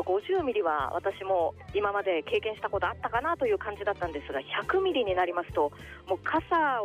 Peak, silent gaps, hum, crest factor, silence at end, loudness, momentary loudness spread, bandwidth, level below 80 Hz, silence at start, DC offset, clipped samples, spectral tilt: -16 dBFS; none; none; 14 dB; 0 s; -29 LUFS; 6 LU; 11.5 kHz; -54 dBFS; 0 s; under 0.1%; under 0.1%; -6 dB/octave